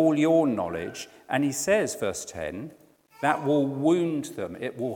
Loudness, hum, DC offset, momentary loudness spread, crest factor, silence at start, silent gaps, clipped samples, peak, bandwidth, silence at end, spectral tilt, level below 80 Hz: -26 LUFS; none; under 0.1%; 13 LU; 18 dB; 0 s; none; under 0.1%; -8 dBFS; 18 kHz; 0 s; -5 dB/octave; -64 dBFS